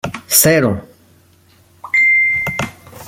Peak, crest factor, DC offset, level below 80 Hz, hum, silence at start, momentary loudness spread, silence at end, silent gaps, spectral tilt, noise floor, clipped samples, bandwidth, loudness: 0 dBFS; 16 dB; under 0.1%; -48 dBFS; none; 0.05 s; 14 LU; 0 s; none; -3 dB/octave; -50 dBFS; under 0.1%; 17 kHz; -12 LUFS